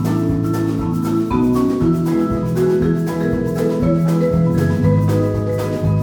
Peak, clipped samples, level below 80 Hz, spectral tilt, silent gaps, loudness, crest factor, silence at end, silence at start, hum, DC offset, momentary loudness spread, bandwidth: -4 dBFS; under 0.1%; -36 dBFS; -8.5 dB/octave; none; -17 LUFS; 12 dB; 0 s; 0 s; none; under 0.1%; 4 LU; 19 kHz